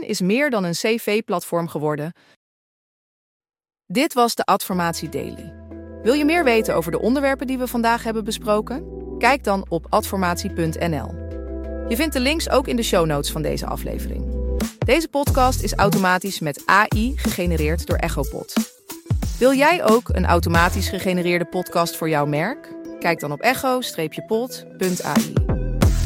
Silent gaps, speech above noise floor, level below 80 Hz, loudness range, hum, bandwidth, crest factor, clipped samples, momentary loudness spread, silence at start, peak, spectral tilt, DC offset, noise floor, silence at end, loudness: 2.36-3.40 s; over 70 dB; -32 dBFS; 5 LU; none; 16.5 kHz; 20 dB; under 0.1%; 11 LU; 0 s; -2 dBFS; -5 dB/octave; under 0.1%; under -90 dBFS; 0 s; -21 LUFS